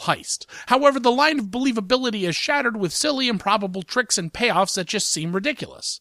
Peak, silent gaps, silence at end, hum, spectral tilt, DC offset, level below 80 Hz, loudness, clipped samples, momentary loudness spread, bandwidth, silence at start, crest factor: -4 dBFS; none; 0.05 s; none; -3 dB/octave; under 0.1%; -58 dBFS; -21 LUFS; under 0.1%; 7 LU; 15.5 kHz; 0 s; 18 dB